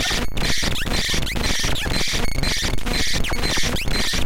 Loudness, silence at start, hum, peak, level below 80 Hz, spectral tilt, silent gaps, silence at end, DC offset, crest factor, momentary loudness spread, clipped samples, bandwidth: -22 LUFS; 0 s; none; -8 dBFS; -26 dBFS; -2.5 dB/octave; none; 0 s; 5%; 12 dB; 2 LU; under 0.1%; 17 kHz